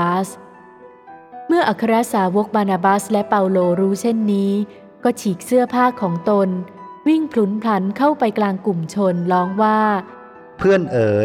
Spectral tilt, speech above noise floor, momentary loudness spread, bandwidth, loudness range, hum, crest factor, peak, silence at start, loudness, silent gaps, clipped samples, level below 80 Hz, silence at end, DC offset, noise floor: -6.5 dB/octave; 26 dB; 7 LU; 15.5 kHz; 2 LU; none; 16 dB; -2 dBFS; 0 s; -18 LUFS; none; under 0.1%; -58 dBFS; 0 s; under 0.1%; -43 dBFS